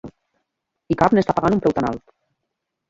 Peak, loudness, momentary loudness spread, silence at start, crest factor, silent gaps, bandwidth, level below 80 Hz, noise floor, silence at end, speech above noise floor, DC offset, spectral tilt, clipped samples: -2 dBFS; -19 LUFS; 10 LU; 0.05 s; 20 dB; none; 7.8 kHz; -48 dBFS; -79 dBFS; 0.9 s; 61 dB; under 0.1%; -8 dB/octave; under 0.1%